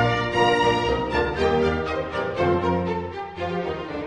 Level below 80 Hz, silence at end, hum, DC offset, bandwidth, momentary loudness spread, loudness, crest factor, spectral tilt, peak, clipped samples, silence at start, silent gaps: -42 dBFS; 0 s; none; under 0.1%; 10.5 kHz; 9 LU; -23 LUFS; 16 dB; -6 dB/octave; -6 dBFS; under 0.1%; 0 s; none